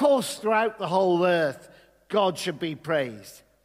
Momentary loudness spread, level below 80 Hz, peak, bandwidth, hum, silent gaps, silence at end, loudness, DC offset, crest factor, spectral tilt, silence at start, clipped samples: 11 LU; -70 dBFS; -10 dBFS; 16 kHz; none; none; 0.3 s; -25 LUFS; under 0.1%; 16 dB; -5 dB/octave; 0 s; under 0.1%